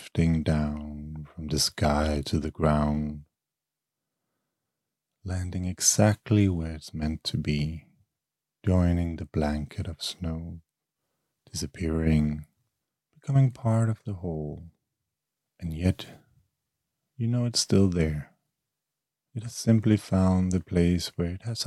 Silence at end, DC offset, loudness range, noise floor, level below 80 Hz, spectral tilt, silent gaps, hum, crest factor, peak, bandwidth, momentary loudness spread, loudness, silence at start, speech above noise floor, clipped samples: 0 s; under 0.1%; 5 LU; -88 dBFS; -44 dBFS; -5.5 dB/octave; none; none; 22 dB; -6 dBFS; 14.5 kHz; 15 LU; -27 LUFS; 0 s; 63 dB; under 0.1%